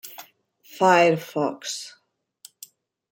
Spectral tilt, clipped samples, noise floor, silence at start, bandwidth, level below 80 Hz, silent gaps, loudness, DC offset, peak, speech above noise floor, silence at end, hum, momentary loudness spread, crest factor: -4 dB/octave; under 0.1%; -55 dBFS; 0.05 s; 17 kHz; -76 dBFS; none; -21 LUFS; under 0.1%; -4 dBFS; 34 dB; 1.25 s; none; 26 LU; 22 dB